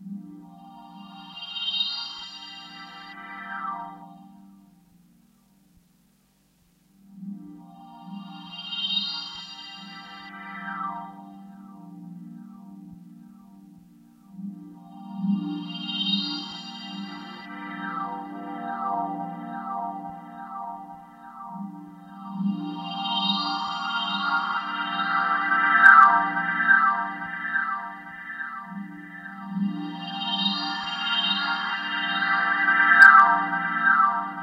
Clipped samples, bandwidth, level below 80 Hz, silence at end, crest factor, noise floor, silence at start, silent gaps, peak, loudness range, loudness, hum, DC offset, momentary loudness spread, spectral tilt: under 0.1%; 12 kHz; -74 dBFS; 0 s; 26 dB; -64 dBFS; 0 s; none; 0 dBFS; 21 LU; -22 LUFS; none; under 0.1%; 23 LU; -4.5 dB/octave